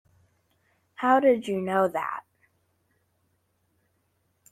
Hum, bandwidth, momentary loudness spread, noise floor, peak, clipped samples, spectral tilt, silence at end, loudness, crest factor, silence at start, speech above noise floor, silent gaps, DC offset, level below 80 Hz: none; 14.5 kHz; 12 LU; -72 dBFS; -8 dBFS; under 0.1%; -6.5 dB/octave; 2.3 s; -24 LUFS; 20 dB; 1 s; 49 dB; none; under 0.1%; -74 dBFS